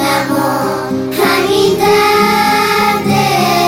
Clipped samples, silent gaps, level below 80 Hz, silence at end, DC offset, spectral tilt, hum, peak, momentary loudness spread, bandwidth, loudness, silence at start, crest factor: under 0.1%; none; -44 dBFS; 0 s; under 0.1%; -4 dB/octave; none; 0 dBFS; 6 LU; 17 kHz; -11 LUFS; 0 s; 12 dB